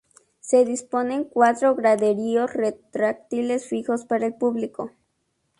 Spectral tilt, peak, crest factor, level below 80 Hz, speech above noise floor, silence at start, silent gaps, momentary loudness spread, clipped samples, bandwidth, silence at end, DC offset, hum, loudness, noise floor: -5 dB/octave; -4 dBFS; 18 dB; -68 dBFS; 51 dB; 0.45 s; none; 9 LU; under 0.1%; 11.5 kHz; 0.7 s; under 0.1%; none; -23 LUFS; -73 dBFS